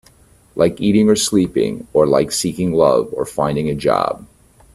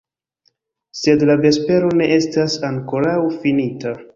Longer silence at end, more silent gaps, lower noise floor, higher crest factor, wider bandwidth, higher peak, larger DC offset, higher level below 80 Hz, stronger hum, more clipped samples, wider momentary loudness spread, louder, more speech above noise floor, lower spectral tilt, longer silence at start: first, 0.5 s vs 0.1 s; neither; second, -50 dBFS vs -65 dBFS; about the same, 16 dB vs 16 dB; first, 15 kHz vs 7.6 kHz; about the same, 0 dBFS vs -2 dBFS; neither; first, -46 dBFS vs -54 dBFS; neither; neither; about the same, 7 LU vs 8 LU; about the same, -16 LUFS vs -17 LUFS; second, 34 dB vs 49 dB; about the same, -5 dB/octave vs -6 dB/octave; second, 0.55 s vs 0.95 s